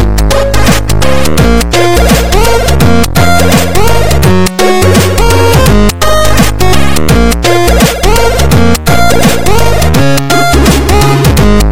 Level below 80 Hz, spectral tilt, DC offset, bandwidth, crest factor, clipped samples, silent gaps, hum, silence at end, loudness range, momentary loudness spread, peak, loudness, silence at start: -12 dBFS; -5 dB/octave; 30%; over 20 kHz; 8 dB; 0.6%; none; none; 0 s; 1 LU; 3 LU; 0 dBFS; -7 LUFS; 0 s